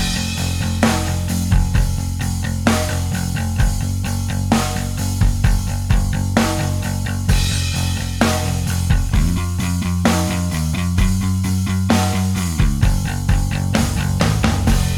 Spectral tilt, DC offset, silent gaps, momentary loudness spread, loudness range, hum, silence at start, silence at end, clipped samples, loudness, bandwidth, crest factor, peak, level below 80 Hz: -5 dB/octave; under 0.1%; none; 4 LU; 2 LU; none; 0 s; 0 s; under 0.1%; -19 LUFS; 18 kHz; 16 dB; 0 dBFS; -22 dBFS